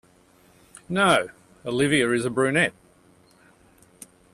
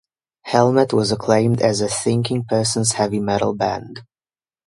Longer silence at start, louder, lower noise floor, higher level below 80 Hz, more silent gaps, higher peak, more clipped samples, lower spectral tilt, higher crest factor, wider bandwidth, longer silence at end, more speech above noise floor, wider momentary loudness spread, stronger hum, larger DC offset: first, 0.9 s vs 0.45 s; second, -22 LUFS vs -18 LUFS; second, -57 dBFS vs under -90 dBFS; second, -62 dBFS vs -52 dBFS; neither; second, -6 dBFS vs 0 dBFS; neither; about the same, -4.5 dB/octave vs -5 dB/octave; about the same, 20 dB vs 18 dB; first, 14 kHz vs 11.5 kHz; first, 1.65 s vs 0.65 s; second, 35 dB vs over 72 dB; first, 10 LU vs 7 LU; neither; neither